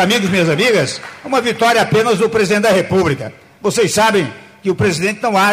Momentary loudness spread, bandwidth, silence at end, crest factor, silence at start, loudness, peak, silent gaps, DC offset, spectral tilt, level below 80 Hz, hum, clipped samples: 9 LU; 16 kHz; 0 s; 10 dB; 0 s; -14 LUFS; -4 dBFS; none; under 0.1%; -4.5 dB/octave; -48 dBFS; none; under 0.1%